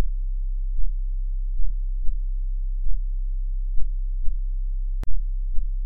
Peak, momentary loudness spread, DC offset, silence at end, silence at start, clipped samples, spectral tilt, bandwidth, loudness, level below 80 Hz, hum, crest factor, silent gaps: -8 dBFS; 0 LU; under 0.1%; 0 s; 0 s; under 0.1%; -9 dB/octave; 0.5 kHz; -32 LUFS; -24 dBFS; none; 12 dB; none